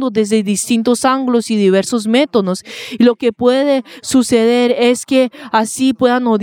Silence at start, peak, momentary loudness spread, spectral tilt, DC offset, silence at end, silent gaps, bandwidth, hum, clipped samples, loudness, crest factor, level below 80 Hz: 0 s; 0 dBFS; 4 LU; -4.5 dB/octave; under 0.1%; 0 s; none; 16.5 kHz; none; under 0.1%; -14 LUFS; 12 dB; -56 dBFS